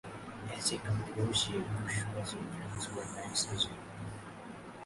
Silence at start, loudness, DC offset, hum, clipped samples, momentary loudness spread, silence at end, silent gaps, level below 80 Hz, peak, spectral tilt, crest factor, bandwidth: 0.05 s; -36 LUFS; under 0.1%; none; under 0.1%; 14 LU; 0 s; none; -58 dBFS; -18 dBFS; -3.5 dB/octave; 20 dB; 11.5 kHz